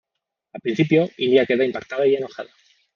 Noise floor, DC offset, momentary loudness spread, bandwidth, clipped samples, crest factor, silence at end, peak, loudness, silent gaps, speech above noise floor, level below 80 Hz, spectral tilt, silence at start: -80 dBFS; under 0.1%; 15 LU; 6.8 kHz; under 0.1%; 18 dB; 0.5 s; -2 dBFS; -20 LUFS; none; 60 dB; -68 dBFS; -7 dB/octave; 0.55 s